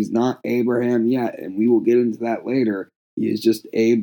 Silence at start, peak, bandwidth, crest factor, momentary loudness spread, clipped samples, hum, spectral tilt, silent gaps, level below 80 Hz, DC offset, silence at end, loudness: 0 s; -6 dBFS; 19 kHz; 14 dB; 8 LU; under 0.1%; none; -7 dB/octave; 2.96-3.17 s; -82 dBFS; under 0.1%; 0 s; -20 LUFS